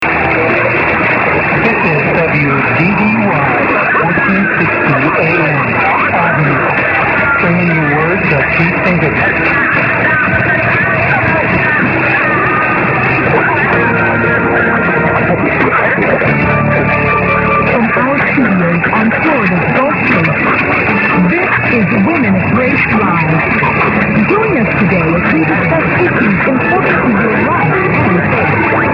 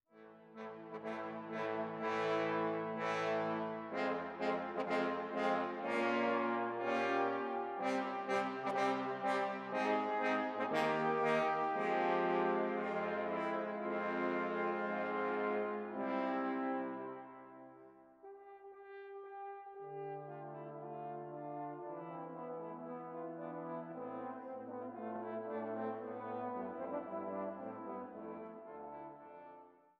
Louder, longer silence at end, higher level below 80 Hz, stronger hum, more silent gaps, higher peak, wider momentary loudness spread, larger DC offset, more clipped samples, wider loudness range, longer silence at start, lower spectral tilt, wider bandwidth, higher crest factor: first, -10 LUFS vs -39 LUFS; second, 0 s vs 0.3 s; first, -34 dBFS vs -86 dBFS; neither; neither; first, 0 dBFS vs -20 dBFS; second, 1 LU vs 16 LU; neither; neither; second, 0 LU vs 12 LU; second, 0 s vs 0.15 s; first, -9 dB/octave vs -6 dB/octave; second, 6 kHz vs 12 kHz; second, 10 dB vs 18 dB